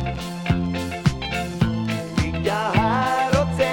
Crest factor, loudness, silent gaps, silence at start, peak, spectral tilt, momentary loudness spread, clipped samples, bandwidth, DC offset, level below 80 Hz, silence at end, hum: 18 dB; -22 LUFS; none; 0 s; -4 dBFS; -6 dB/octave; 6 LU; under 0.1%; 18 kHz; under 0.1%; -36 dBFS; 0 s; none